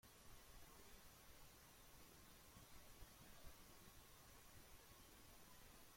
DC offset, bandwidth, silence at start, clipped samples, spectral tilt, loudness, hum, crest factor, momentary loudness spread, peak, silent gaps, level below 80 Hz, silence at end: under 0.1%; 16.5 kHz; 0.05 s; under 0.1%; -3 dB/octave; -65 LUFS; none; 16 dB; 1 LU; -48 dBFS; none; -70 dBFS; 0 s